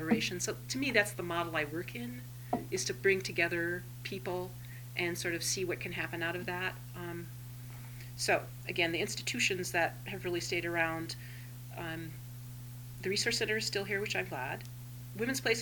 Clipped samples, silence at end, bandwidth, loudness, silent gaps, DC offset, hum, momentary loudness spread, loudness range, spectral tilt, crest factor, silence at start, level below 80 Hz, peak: under 0.1%; 0 s; 19 kHz; -34 LUFS; none; under 0.1%; none; 15 LU; 3 LU; -3.5 dB/octave; 22 dB; 0 s; -60 dBFS; -14 dBFS